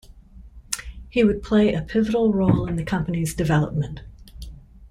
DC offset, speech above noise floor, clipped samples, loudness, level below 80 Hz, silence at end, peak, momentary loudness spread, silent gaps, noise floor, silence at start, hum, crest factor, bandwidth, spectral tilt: under 0.1%; 24 dB; under 0.1%; -22 LUFS; -40 dBFS; 0.05 s; 0 dBFS; 21 LU; none; -45 dBFS; 0.15 s; none; 22 dB; 16 kHz; -6.5 dB/octave